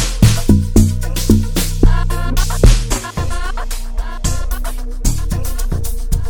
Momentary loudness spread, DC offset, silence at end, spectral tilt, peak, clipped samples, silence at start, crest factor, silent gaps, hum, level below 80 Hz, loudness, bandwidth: 11 LU; under 0.1%; 0 s; -5.5 dB/octave; 0 dBFS; under 0.1%; 0 s; 14 dB; none; none; -16 dBFS; -17 LUFS; 18.5 kHz